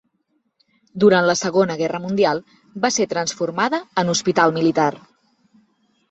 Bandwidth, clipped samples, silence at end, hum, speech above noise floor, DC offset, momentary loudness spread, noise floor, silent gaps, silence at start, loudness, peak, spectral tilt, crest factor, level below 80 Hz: 8.2 kHz; under 0.1%; 1.1 s; none; 50 dB; under 0.1%; 8 LU; -69 dBFS; none; 0.95 s; -19 LUFS; -2 dBFS; -4 dB/octave; 18 dB; -62 dBFS